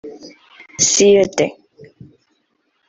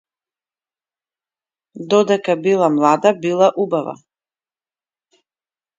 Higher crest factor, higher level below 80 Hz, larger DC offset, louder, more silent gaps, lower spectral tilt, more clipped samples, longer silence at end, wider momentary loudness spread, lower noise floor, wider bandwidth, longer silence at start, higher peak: about the same, 18 dB vs 20 dB; first, -56 dBFS vs -70 dBFS; neither; about the same, -14 LUFS vs -16 LUFS; neither; second, -2.5 dB/octave vs -5.5 dB/octave; neither; second, 1.35 s vs 1.85 s; first, 23 LU vs 8 LU; second, -66 dBFS vs under -90 dBFS; about the same, 8.2 kHz vs 7.8 kHz; second, 0.05 s vs 1.75 s; about the same, 0 dBFS vs 0 dBFS